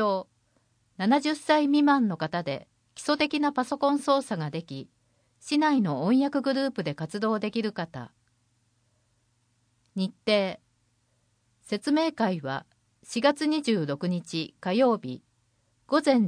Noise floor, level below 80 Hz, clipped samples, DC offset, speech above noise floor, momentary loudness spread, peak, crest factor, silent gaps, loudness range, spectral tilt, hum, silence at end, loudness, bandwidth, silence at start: -70 dBFS; -72 dBFS; under 0.1%; under 0.1%; 44 dB; 13 LU; -10 dBFS; 18 dB; none; 8 LU; -5.5 dB/octave; none; 0 s; -27 LUFS; 10.5 kHz; 0 s